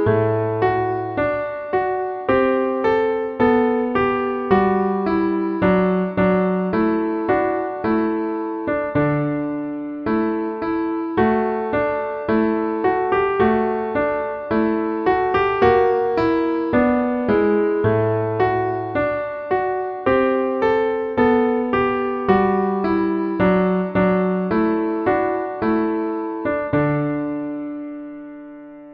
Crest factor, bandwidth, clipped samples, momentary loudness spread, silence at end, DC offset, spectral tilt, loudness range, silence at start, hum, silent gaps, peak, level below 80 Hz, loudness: 16 dB; 5.6 kHz; under 0.1%; 6 LU; 0 s; under 0.1%; -10 dB/octave; 3 LU; 0 s; none; none; -4 dBFS; -46 dBFS; -20 LUFS